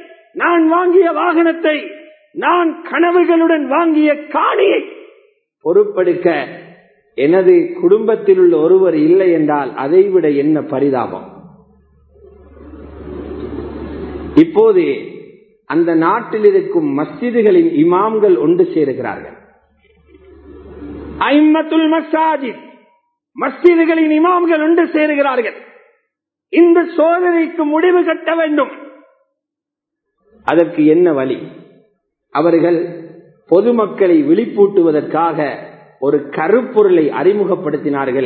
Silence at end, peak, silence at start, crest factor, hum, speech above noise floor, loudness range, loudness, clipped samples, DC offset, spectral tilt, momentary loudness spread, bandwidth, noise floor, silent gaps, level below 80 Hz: 0 s; 0 dBFS; 0.35 s; 14 dB; none; 70 dB; 5 LU; -13 LUFS; under 0.1%; under 0.1%; -9.5 dB/octave; 14 LU; 4.5 kHz; -83 dBFS; none; -48 dBFS